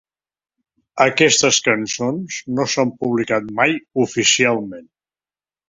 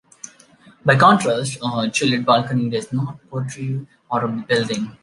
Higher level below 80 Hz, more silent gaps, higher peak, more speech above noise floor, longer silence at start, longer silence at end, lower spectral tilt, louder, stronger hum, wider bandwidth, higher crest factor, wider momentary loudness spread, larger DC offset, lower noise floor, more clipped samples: about the same, -60 dBFS vs -60 dBFS; neither; about the same, 0 dBFS vs 0 dBFS; first, over 72 dB vs 31 dB; about the same, 0.95 s vs 0.85 s; first, 0.85 s vs 0.1 s; second, -2.5 dB/octave vs -5 dB/octave; about the same, -17 LUFS vs -19 LUFS; neither; second, 7.8 kHz vs 11.5 kHz; about the same, 18 dB vs 20 dB; second, 11 LU vs 15 LU; neither; first, under -90 dBFS vs -50 dBFS; neither